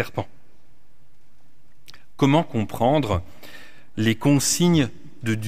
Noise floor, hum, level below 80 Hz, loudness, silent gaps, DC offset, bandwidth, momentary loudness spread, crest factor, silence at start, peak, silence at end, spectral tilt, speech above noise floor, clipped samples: -60 dBFS; none; -50 dBFS; -21 LUFS; none; 2%; 16 kHz; 21 LU; 18 dB; 0 s; -6 dBFS; 0 s; -5 dB/octave; 39 dB; under 0.1%